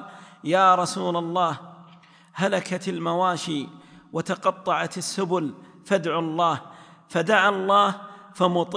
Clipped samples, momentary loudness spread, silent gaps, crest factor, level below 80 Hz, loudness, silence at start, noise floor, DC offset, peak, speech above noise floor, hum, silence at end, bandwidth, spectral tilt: under 0.1%; 14 LU; none; 20 dB; -74 dBFS; -23 LUFS; 0 s; -52 dBFS; under 0.1%; -4 dBFS; 29 dB; none; 0 s; 10.5 kHz; -4.5 dB/octave